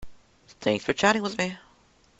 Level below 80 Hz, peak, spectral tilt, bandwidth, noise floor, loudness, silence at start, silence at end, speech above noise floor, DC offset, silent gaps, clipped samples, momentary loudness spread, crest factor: -56 dBFS; -6 dBFS; -4 dB/octave; 8.2 kHz; -60 dBFS; -26 LUFS; 0 s; 0.6 s; 35 dB; under 0.1%; none; under 0.1%; 9 LU; 22 dB